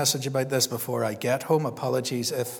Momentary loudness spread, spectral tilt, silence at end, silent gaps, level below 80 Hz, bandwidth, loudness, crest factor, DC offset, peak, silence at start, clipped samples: 4 LU; -3.5 dB/octave; 0 s; none; -74 dBFS; 19.5 kHz; -26 LUFS; 18 dB; under 0.1%; -10 dBFS; 0 s; under 0.1%